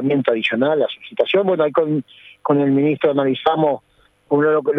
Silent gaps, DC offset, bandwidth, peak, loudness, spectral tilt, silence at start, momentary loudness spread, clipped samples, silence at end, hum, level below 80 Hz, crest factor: none; under 0.1%; 5.4 kHz; -2 dBFS; -18 LUFS; -8.5 dB/octave; 0 s; 6 LU; under 0.1%; 0 s; none; -64 dBFS; 16 dB